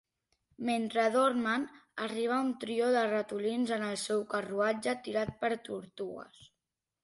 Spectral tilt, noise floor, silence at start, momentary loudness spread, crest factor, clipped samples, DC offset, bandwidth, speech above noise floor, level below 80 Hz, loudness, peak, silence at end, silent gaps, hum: -4.5 dB/octave; -88 dBFS; 0.6 s; 12 LU; 16 dB; under 0.1%; under 0.1%; 11.5 kHz; 56 dB; -70 dBFS; -32 LUFS; -18 dBFS; 0.75 s; none; none